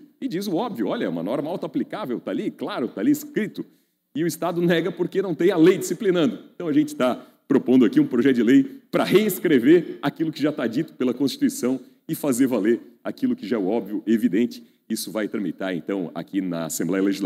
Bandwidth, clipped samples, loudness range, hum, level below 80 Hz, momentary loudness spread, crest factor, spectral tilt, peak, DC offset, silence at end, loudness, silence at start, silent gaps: 16 kHz; under 0.1%; 7 LU; none; -76 dBFS; 11 LU; 16 dB; -5.5 dB/octave; -6 dBFS; under 0.1%; 0 s; -23 LUFS; 0.2 s; none